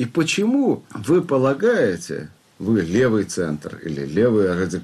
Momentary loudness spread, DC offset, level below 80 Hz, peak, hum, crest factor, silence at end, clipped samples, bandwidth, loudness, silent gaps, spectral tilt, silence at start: 11 LU; under 0.1%; -54 dBFS; -8 dBFS; none; 12 dB; 0 s; under 0.1%; 13.5 kHz; -20 LUFS; none; -6 dB/octave; 0 s